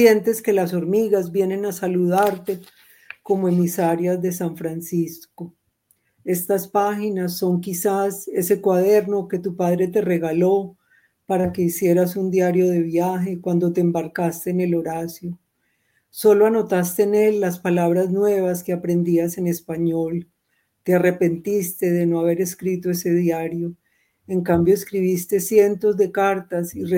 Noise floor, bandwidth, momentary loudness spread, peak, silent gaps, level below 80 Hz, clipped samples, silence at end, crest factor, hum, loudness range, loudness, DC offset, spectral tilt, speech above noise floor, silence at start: -70 dBFS; 17 kHz; 9 LU; -2 dBFS; none; -60 dBFS; under 0.1%; 0 s; 20 dB; none; 4 LU; -20 LUFS; under 0.1%; -6.5 dB/octave; 50 dB; 0 s